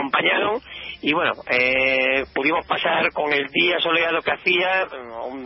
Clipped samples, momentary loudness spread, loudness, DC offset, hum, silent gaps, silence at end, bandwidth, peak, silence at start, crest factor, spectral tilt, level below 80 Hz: under 0.1%; 9 LU; -20 LUFS; under 0.1%; none; none; 0 s; 5.8 kHz; -6 dBFS; 0 s; 16 dB; -8 dB/octave; -54 dBFS